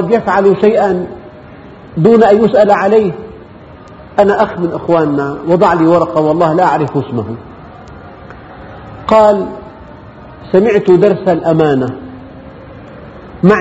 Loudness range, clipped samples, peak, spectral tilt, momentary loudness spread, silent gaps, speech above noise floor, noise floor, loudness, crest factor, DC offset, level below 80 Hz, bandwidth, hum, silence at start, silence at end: 5 LU; 0.3%; 0 dBFS; -8 dB/octave; 24 LU; none; 24 dB; -34 dBFS; -11 LUFS; 12 dB; under 0.1%; -42 dBFS; 8 kHz; none; 0 s; 0 s